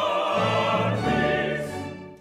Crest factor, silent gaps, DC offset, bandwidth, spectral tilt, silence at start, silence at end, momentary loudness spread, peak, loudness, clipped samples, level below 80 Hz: 14 dB; none; under 0.1%; 15 kHz; -6 dB/octave; 0 s; 0.05 s; 11 LU; -10 dBFS; -24 LUFS; under 0.1%; -50 dBFS